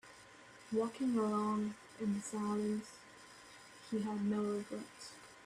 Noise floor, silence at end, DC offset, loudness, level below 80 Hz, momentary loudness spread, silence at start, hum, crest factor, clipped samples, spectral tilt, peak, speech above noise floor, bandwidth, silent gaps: -59 dBFS; 0 s; under 0.1%; -38 LUFS; -76 dBFS; 20 LU; 0.05 s; none; 16 dB; under 0.1%; -6 dB/octave; -24 dBFS; 21 dB; 12.5 kHz; none